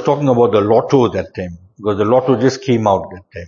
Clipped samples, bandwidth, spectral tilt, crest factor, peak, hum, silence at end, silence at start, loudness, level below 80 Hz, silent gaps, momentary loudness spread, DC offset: under 0.1%; 7.4 kHz; -7 dB/octave; 14 dB; 0 dBFS; none; 0 s; 0 s; -14 LUFS; -50 dBFS; none; 14 LU; under 0.1%